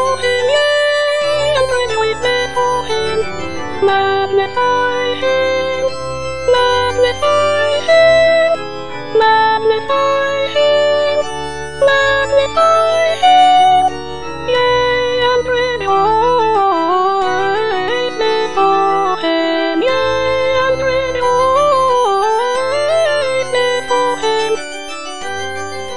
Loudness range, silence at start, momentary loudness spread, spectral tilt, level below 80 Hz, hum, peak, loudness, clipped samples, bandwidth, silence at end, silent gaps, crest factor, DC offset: 4 LU; 0 s; 9 LU; -3.5 dB/octave; -42 dBFS; none; 0 dBFS; -14 LUFS; under 0.1%; 10 kHz; 0 s; none; 14 dB; 3%